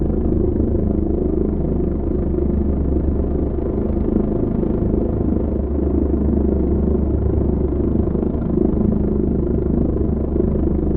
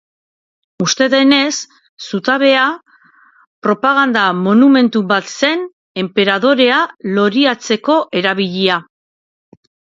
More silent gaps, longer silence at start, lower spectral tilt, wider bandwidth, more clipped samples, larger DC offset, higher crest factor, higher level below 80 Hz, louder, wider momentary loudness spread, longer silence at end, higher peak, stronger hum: second, none vs 1.89-1.97 s, 3.47-3.62 s, 5.73-5.95 s; second, 0 s vs 0.8 s; first, -15 dB/octave vs -4 dB/octave; second, 2.4 kHz vs 7.8 kHz; neither; neither; about the same, 14 dB vs 14 dB; first, -22 dBFS vs -62 dBFS; second, -19 LUFS vs -13 LUFS; second, 2 LU vs 11 LU; second, 0 s vs 1.15 s; about the same, -2 dBFS vs 0 dBFS; neither